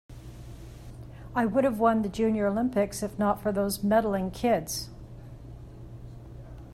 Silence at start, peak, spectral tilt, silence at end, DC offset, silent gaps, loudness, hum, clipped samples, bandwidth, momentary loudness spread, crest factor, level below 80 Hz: 0.1 s; -10 dBFS; -5.5 dB/octave; 0 s; under 0.1%; none; -27 LUFS; none; under 0.1%; 16 kHz; 21 LU; 18 dB; -48 dBFS